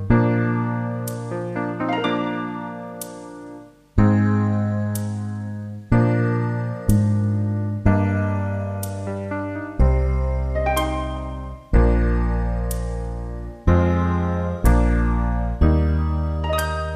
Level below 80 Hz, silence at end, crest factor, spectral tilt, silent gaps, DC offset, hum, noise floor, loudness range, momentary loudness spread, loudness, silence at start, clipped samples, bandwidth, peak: -26 dBFS; 0 s; 18 dB; -7.5 dB/octave; none; under 0.1%; 50 Hz at -50 dBFS; -41 dBFS; 3 LU; 12 LU; -22 LUFS; 0 s; under 0.1%; 15.5 kHz; -2 dBFS